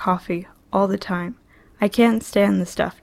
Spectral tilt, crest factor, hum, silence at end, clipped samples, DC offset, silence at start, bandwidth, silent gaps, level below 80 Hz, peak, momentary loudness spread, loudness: -6 dB/octave; 18 dB; none; 0.1 s; under 0.1%; under 0.1%; 0 s; 15.5 kHz; none; -50 dBFS; -4 dBFS; 11 LU; -21 LUFS